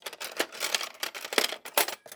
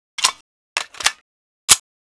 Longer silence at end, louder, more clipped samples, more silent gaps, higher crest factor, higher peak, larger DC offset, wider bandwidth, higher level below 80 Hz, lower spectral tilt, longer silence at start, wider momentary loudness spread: second, 0 s vs 0.4 s; second, -29 LUFS vs -18 LUFS; second, under 0.1% vs 0.2%; second, none vs 0.41-0.76 s, 1.21-1.68 s; about the same, 26 dB vs 22 dB; second, -6 dBFS vs 0 dBFS; neither; first, over 20 kHz vs 11 kHz; second, -86 dBFS vs -54 dBFS; first, 1 dB/octave vs 2.5 dB/octave; second, 0.05 s vs 0.2 s; second, 7 LU vs 13 LU